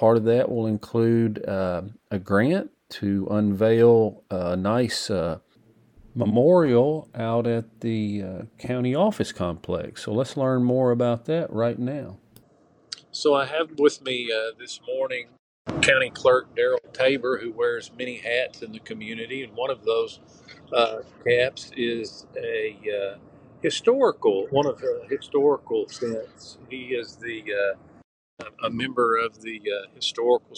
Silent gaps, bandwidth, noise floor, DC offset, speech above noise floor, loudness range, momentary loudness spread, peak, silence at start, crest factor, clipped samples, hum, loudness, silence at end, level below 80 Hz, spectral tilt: 15.39-15.65 s, 28.04-28.37 s; 10.5 kHz; -59 dBFS; under 0.1%; 35 dB; 5 LU; 14 LU; -2 dBFS; 0 s; 22 dB; under 0.1%; none; -24 LUFS; 0 s; -60 dBFS; -5.5 dB/octave